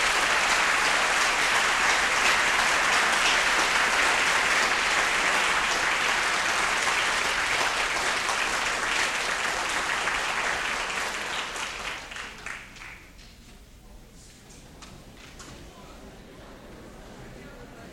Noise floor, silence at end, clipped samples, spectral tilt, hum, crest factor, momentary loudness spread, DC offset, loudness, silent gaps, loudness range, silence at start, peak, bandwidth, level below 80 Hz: -49 dBFS; 0 s; under 0.1%; 0 dB/octave; none; 18 dB; 16 LU; under 0.1%; -23 LUFS; none; 14 LU; 0 s; -10 dBFS; 16.5 kHz; -50 dBFS